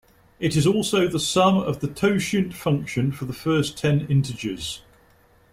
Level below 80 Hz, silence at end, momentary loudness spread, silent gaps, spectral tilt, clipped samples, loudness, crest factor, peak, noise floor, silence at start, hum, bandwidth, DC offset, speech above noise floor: -50 dBFS; 0.7 s; 9 LU; none; -5.5 dB/octave; under 0.1%; -23 LUFS; 16 dB; -6 dBFS; -56 dBFS; 0.4 s; none; 16 kHz; under 0.1%; 35 dB